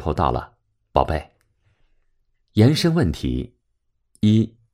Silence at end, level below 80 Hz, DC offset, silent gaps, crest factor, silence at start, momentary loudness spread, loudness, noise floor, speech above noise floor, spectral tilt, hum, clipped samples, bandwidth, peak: 0.25 s; -36 dBFS; under 0.1%; none; 22 dB; 0 s; 12 LU; -21 LUFS; -71 dBFS; 52 dB; -7 dB/octave; none; under 0.1%; 15.5 kHz; 0 dBFS